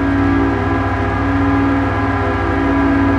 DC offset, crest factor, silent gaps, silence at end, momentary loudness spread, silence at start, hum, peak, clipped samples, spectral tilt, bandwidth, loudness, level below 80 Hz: under 0.1%; 10 dB; none; 0 s; 3 LU; 0 s; none; -4 dBFS; under 0.1%; -8.5 dB/octave; 7.4 kHz; -16 LUFS; -26 dBFS